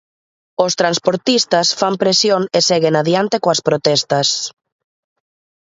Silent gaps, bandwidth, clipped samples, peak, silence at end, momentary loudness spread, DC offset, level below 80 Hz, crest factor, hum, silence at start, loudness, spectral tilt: none; 8 kHz; under 0.1%; 0 dBFS; 1.2 s; 4 LU; under 0.1%; -62 dBFS; 16 dB; none; 0.6 s; -15 LUFS; -3.5 dB/octave